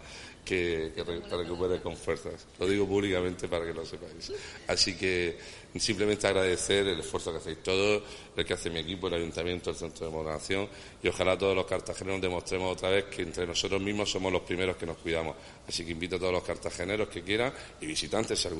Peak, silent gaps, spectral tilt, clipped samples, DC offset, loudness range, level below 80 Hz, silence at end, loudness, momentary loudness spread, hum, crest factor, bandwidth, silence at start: -8 dBFS; none; -3.5 dB/octave; under 0.1%; under 0.1%; 3 LU; -52 dBFS; 0 s; -31 LUFS; 10 LU; none; 22 dB; 11.5 kHz; 0 s